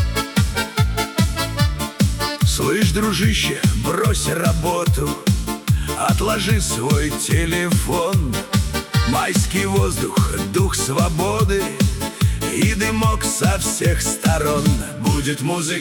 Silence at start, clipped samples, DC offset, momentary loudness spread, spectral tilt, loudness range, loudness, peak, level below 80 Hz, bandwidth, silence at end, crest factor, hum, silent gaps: 0 s; under 0.1%; under 0.1%; 3 LU; -4.5 dB/octave; 1 LU; -19 LUFS; -4 dBFS; -28 dBFS; 18 kHz; 0 s; 14 dB; none; none